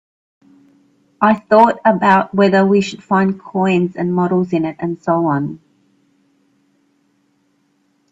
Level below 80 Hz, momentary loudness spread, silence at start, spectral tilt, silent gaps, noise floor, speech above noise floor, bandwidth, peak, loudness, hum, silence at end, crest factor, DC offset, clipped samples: -58 dBFS; 8 LU; 1.2 s; -7.5 dB/octave; none; -61 dBFS; 47 dB; 7.8 kHz; 0 dBFS; -15 LUFS; none; 2.55 s; 16 dB; under 0.1%; under 0.1%